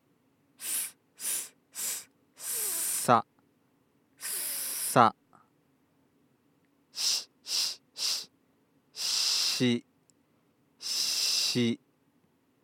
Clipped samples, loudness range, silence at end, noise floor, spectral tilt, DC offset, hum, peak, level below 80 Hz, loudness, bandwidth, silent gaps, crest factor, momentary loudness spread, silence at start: under 0.1%; 4 LU; 0.9 s; -69 dBFS; -2 dB/octave; under 0.1%; none; -4 dBFS; -88 dBFS; -29 LUFS; 17.5 kHz; none; 28 dB; 15 LU; 0.6 s